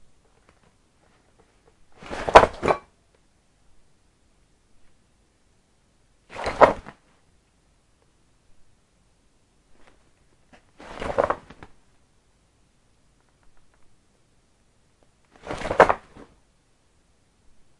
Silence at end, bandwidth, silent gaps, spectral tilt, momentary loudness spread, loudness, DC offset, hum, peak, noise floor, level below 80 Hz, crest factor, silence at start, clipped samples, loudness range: 1.85 s; 11.5 kHz; none; -4.5 dB/octave; 29 LU; -21 LUFS; under 0.1%; none; 0 dBFS; -63 dBFS; -48 dBFS; 28 dB; 2.05 s; under 0.1%; 11 LU